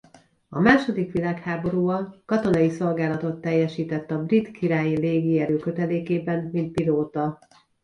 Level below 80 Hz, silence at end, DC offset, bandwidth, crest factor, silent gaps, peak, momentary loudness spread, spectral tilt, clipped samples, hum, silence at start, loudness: -56 dBFS; 0.5 s; under 0.1%; 10.5 kHz; 20 dB; none; -4 dBFS; 7 LU; -8 dB/octave; under 0.1%; none; 0.5 s; -24 LUFS